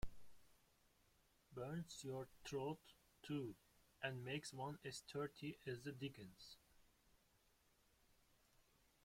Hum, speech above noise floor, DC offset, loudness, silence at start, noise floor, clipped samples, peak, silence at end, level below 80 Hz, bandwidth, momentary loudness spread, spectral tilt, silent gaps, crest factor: none; 28 dB; under 0.1%; -51 LUFS; 0 s; -79 dBFS; under 0.1%; -28 dBFS; 2.15 s; -68 dBFS; 16.5 kHz; 12 LU; -5 dB/octave; none; 24 dB